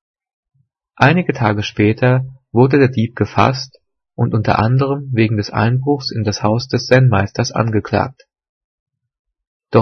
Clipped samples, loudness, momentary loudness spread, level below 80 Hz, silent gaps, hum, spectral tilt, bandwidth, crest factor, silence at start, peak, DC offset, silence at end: under 0.1%; -16 LUFS; 7 LU; -48 dBFS; 8.49-8.86 s, 9.19-9.25 s, 9.47-9.60 s; none; -6.5 dB/octave; 6.6 kHz; 16 dB; 1 s; 0 dBFS; under 0.1%; 0 s